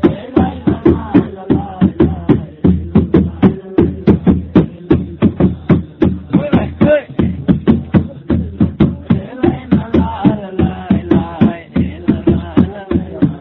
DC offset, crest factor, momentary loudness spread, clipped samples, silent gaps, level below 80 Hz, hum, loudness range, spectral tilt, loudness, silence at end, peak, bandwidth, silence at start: under 0.1%; 14 dB; 5 LU; 0.2%; none; -26 dBFS; none; 2 LU; -11 dB/octave; -14 LUFS; 0 s; 0 dBFS; 4.2 kHz; 0 s